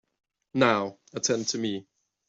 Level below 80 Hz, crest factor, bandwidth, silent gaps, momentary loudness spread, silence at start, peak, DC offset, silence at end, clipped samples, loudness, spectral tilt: -70 dBFS; 22 dB; 8.2 kHz; none; 11 LU; 0.55 s; -8 dBFS; under 0.1%; 0.45 s; under 0.1%; -27 LUFS; -3.5 dB/octave